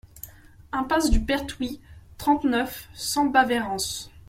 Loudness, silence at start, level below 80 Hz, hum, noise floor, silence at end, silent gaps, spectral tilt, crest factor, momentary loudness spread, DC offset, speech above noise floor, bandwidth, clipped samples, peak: -25 LUFS; 0.15 s; -34 dBFS; none; -45 dBFS; 0.1 s; none; -3.5 dB/octave; 20 dB; 16 LU; under 0.1%; 22 dB; 16.5 kHz; under 0.1%; -6 dBFS